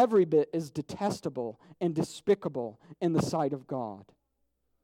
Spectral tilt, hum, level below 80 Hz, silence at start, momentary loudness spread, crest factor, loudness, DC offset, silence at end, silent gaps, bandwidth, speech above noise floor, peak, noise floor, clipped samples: -7 dB/octave; none; -66 dBFS; 0 s; 12 LU; 18 dB; -31 LUFS; under 0.1%; 0.8 s; none; 15.5 kHz; 47 dB; -12 dBFS; -77 dBFS; under 0.1%